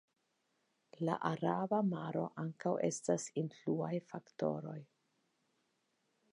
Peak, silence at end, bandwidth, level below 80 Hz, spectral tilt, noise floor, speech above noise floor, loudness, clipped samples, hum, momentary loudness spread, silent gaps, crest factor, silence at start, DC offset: -18 dBFS; 1.5 s; 10.5 kHz; -84 dBFS; -6.5 dB/octave; -81 dBFS; 43 dB; -38 LUFS; under 0.1%; none; 8 LU; none; 22 dB; 1 s; under 0.1%